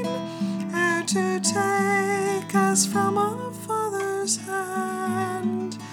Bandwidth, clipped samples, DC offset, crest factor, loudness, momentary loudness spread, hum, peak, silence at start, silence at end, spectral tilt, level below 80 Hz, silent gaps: 18.5 kHz; under 0.1%; under 0.1%; 16 dB; -24 LUFS; 8 LU; none; -8 dBFS; 0 s; 0 s; -3.5 dB/octave; -72 dBFS; none